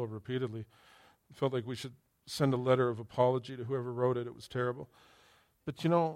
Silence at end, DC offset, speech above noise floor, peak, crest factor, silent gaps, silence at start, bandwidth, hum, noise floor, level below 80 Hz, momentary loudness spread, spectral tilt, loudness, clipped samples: 0 s; under 0.1%; 33 dB; -14 dBFS; 20 dB; none; 0 s; 15 kHz; none; -66 dBFS; -70 dBFS; 16 LU; -7 dB/octave; -34 LUFS; under 0.1%